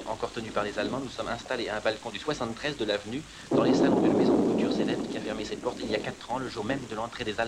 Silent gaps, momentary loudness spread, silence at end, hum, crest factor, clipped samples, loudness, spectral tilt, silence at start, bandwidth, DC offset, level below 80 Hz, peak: none; 11 LU; 0 s; none; 18 dB; under 0.1%; -29 LUFS; -5.5 dB/octave; 0 s; 12.5 kHz; under 0.1%; -56 dBFS; -10 dBFS